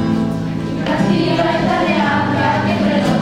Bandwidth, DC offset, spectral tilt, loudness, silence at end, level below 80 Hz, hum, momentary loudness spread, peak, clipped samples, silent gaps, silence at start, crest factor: 11.5 kHz; under 0.1%; -6.5 dB/octave; -16 LUFS; 0 s; -40 dBFS; none; 5 LU; -2 dBFS; under 0.1%; none; 0 s; 14 dB